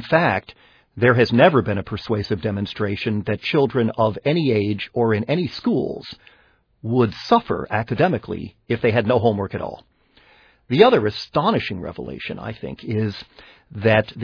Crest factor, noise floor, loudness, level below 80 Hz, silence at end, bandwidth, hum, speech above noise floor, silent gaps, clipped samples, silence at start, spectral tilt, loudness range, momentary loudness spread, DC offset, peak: 20 dB; -55 dBFS; -20 LUFS; -52 dBFS; 0 s; 5.4 kHz; none; 35 dB; none; under 0.1%; 0 s; -8 dB/octave; 3 LU; 15 LU; under 0.1%; 0 dBFS